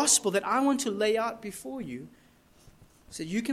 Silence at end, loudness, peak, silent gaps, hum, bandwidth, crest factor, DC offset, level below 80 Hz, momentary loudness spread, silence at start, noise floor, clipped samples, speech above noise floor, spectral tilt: 0 s; -28 LUFS; -10 dBFS; none; none; 16 kHz; 20 dB; under 0.1%; -64 dBFS; 16 LU; 0 s; -59 dBFS; under 0.1%; 30 dB; -2.5 dB/octave